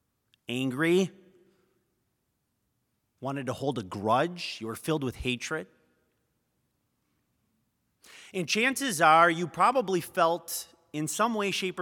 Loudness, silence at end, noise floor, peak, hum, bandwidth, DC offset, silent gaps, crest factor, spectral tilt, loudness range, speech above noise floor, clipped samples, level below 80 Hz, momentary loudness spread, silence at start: -28 LUFS; 0 s; -78 dBFS; -6 dBFS; none; 18 kHz; under 0.1%; none; 24 dB; -4 dB/octave; 12 LU; 50 dB; under 0.1%; -60 dBFS; 13 LU; 0.5 s